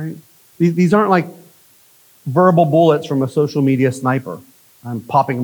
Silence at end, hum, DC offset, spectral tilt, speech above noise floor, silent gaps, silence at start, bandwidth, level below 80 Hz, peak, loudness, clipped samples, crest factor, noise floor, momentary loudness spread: 0 s; none; under 0.1%; -8 dB/octave; 35 dB; none; 0 s; over 20 kHz; -66 dBFS; 0 dBFS; -15 LUFS; under 0.1%; 16 dB; -50 dBFS; 19 LU